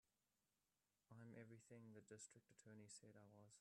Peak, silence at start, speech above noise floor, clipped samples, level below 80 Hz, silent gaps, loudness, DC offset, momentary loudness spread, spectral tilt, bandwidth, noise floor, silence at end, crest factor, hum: -48 dBFS; 0.05 s; over 24 dB; under 0.1%; under -90 dBFS; none; -65 LUFS; under 0.1%; 5 LU; -4.5 dB/octave; 11.5 kHz; under -90 dBFS; 0 s; 18 dB; none